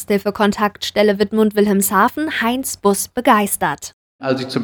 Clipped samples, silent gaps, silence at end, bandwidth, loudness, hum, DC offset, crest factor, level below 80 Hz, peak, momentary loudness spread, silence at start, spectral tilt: under 0.1%; 3.93-4.19 s; 0 s; over 20 kHz; -17 LUFS; none; under 0.1%; 16 dB; -52 dBFS; -2 dBFS; 7 LU; 0 s; -4 dB/octave